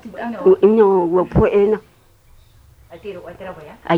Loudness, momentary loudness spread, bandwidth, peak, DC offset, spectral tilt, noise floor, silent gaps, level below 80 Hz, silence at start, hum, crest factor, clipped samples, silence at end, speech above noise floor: -15 LUFS; 22 LU; 4.6 kHz; -2 dBFS; under 0.1%; -9 dB/octave; -49 dBFS; none; -38 dBFS; 0.05 s; none; 16 dB; under 0.1%; 0 s; 33 dB